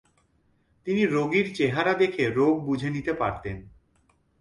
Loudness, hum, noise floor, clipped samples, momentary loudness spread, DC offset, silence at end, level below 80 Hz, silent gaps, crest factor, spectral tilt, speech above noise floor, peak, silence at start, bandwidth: -25 LUFS; none; -66 dBFS; under 0.1%; 13 LU; under 0.1%; 0.7 s; -54 dBFS; none; 16 dB; -6.5 dB/octave; 42 dB; -10 dBFS; 0.85 s; 11.5 kHz